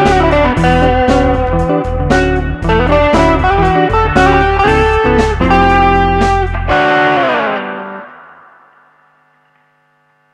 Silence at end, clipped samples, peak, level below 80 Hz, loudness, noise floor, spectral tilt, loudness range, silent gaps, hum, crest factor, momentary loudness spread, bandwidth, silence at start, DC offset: 2.2 s; under 0.1%; 0 dBFS; -20 dBFS; -11 LUFS; -55 dBFS; -6.5 dB/octave; 6 LU; none; none; 12 dB; 6 LU; 11 kHz; 0 s; under 0.1%